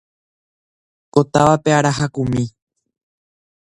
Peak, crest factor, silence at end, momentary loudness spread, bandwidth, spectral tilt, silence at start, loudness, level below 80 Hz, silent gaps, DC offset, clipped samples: 0 dBFS; 20 dB; 1.2 s; 8 LU; 11 kHz; -6 dB/octave; 1.15 s; -17 LUFS; -48 dBFS; none; under 0.1%; under 0.1%